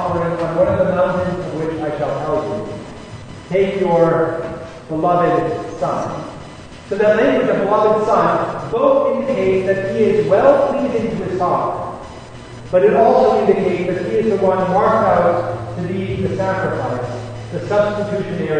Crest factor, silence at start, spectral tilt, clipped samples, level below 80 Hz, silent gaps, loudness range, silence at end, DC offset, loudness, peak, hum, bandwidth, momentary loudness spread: 16 dB; 0 s; -7.5 dB/octave; under 0.1%; -44 dBFS; none; 4 LU; 0 s; under 0.1%; -17 LUFS; 0 dBFS; none; 9.6 kHz; 15 LU